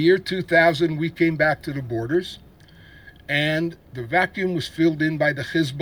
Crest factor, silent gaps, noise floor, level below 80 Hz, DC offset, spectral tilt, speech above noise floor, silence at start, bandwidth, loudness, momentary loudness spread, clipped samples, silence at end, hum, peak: 18 dB; none; -48 dBFS; -52 dBFS; under 0.1%; -6.5 dB/octave; 27 dB; 0 s; 19.5 kHz; -22 LUFS; 10 LU; under 0.1%; 0 s; none; -4 dBFS